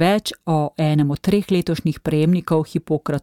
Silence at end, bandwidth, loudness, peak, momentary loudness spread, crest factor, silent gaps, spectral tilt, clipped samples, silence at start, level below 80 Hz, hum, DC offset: 0 s; 16 kHz; -20 LUFS; -6 dBFS; 5 LU; 14 dB; none; -7 dB/octave; under 0.1%; 0 s; -48 dBFS; none; 0.1%